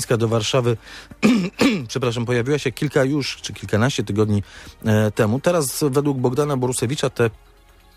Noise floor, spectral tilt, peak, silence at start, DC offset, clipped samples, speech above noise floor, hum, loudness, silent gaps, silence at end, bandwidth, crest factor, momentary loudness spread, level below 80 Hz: -50 dBFS; -5.5 dB/octave; -2 dBFS; 0 s; under 0.1%; under 0.1%; 30 dB; none; -20 LUFS; none; 0.6 s; 15.5 kHz; 18 dB; 6 LU; -50 dBFS